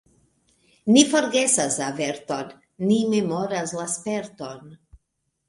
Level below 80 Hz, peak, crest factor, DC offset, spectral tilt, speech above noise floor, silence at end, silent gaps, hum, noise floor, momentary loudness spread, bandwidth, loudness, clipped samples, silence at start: -64 dBFS; -2 dBFS; 22 dB; under 0.1%; -3.5 dB/octave; 54 dB; 0.75 s; none; none; -76 dBFS; 19 LU; 11.5 kHz; -22 LUFS; under 0.1%; 0.85 s